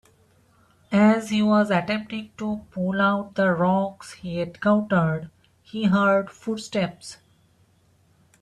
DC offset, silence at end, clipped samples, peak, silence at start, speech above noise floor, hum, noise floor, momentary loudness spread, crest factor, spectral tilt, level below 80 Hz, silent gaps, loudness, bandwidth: under 0.1%; 1.25 s; under 0.1%; -8 dBFS; 0.9 s; 38 dB; none; -61 dBFS; 13 LU; 16 dB; -6.5 dB/octave; -60 dBFS; none; -23 LUFS; 11.5 kHz